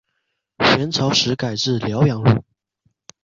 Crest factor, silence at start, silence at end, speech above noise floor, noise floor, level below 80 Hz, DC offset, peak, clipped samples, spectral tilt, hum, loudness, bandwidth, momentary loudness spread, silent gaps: 18 dB; 0.6 s; 0.8 s; 56 dB; -74 dBFS; -48 dBFS; under 0.1%; -2 dBFS; under 0.1%; -5 dB/octave; none; -18 LUFS; 7.6 kHz; 5 LU; none